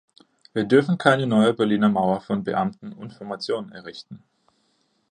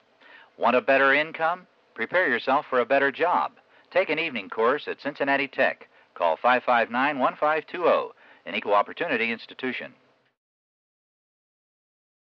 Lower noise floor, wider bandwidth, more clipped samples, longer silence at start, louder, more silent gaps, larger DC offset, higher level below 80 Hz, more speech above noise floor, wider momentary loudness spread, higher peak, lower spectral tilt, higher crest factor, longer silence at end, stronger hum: first, -68 dBFS vs -53 dBFS; first, 9.8 kHz vs 6.4 kHz; neither; about the same, 0.55 s vs 0.6 s; about the same, -22 LUFS vs -24 LUFS; neither; neither; first, -64 dBFS vs -80 dBFS; first, 46 dB vs 29 dB; first, 20 LU vs 11 LU; first, -2 dBFS vs -8 dBFS; about the same, -7 dB/octave vs -6 dB/octave; about the same, 22 dB vs 18 dB; second, 0.95 s vs 2.5 s; neither